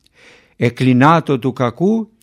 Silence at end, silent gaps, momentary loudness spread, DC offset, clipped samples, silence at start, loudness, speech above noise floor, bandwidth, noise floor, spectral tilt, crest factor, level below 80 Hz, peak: 0.2 s; none; 8 LU; under 0.1%; under 0.1%; 0.6 s; -15 LUFS; 34 dB; 11.5 kHz; -48 dBFS; -7.5 dB/octave; 16 dB; -58 dBFS; 0 dBFS